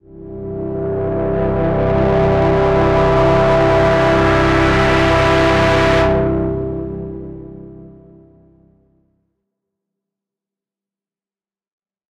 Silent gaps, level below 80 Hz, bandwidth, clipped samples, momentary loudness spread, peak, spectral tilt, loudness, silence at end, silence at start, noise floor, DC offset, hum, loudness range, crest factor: none; -28 dBFS; 11 kHz; under 0.1%; 15 LU; -4 dBFS; -7 dB/octave; -14 LUFS; 4.25 s; 0.1 s; under -90 dBFS; under 0.1%; none; 13 LU; 14 dB